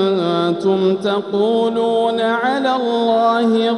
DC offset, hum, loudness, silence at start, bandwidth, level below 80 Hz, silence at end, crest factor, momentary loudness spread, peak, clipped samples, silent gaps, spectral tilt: under 0.1%; none; -16 LUFS; 0 s; 11 kHz; -64 dBFS; 0 s; 12 dB; 3 LU; -4 dBFS; under 0.1%; none; -6.5 dB/octave